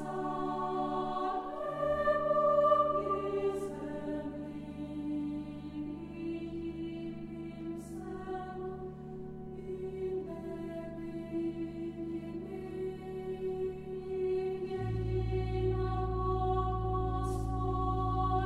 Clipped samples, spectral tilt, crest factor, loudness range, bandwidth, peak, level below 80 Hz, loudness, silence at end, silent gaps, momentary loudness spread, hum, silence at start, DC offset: under 0.1%; -8.5 dB/octave; 20 dB; 10 LU; 12 kHz; -14 dBFS; -46 dBFS; -36 LUFS; 0 s; none; 12 LU; none; 0 s; under 0.1%